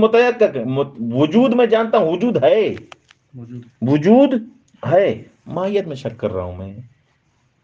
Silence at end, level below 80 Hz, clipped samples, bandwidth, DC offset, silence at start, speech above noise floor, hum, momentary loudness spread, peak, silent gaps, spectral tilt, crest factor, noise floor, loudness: 0.8 s; -62 dBFS; under 0.1%; 7.4 kHz; under 0.1%; 0 s; 45 dB; none; 17 LU; 0 dBFS; none; -8 dB/octave; 16 dB; -62 dBFS; -17 LUFS